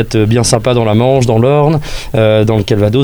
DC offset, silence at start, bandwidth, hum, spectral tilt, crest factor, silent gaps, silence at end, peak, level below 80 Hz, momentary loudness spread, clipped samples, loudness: under 0.1%; 0 s; over 20 kHz; none; -6 dB/octave; 10 dB; none; 0 s; 0 dBFS; -30 dBFS; 3 LU; under 0.1%; -11 LUFS